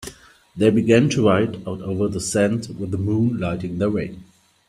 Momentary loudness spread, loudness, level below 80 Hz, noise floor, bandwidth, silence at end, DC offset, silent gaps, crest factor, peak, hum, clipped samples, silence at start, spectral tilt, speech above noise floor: 12 LU; -20 LUFS; -52 dBFS; -42 dBFS; 13.5 kHz; 0.45 s; under 0.1%; none; 20 dB; -2 dBFS; none; under 0.1%; 0 s; -6 dB/octave; 23 dB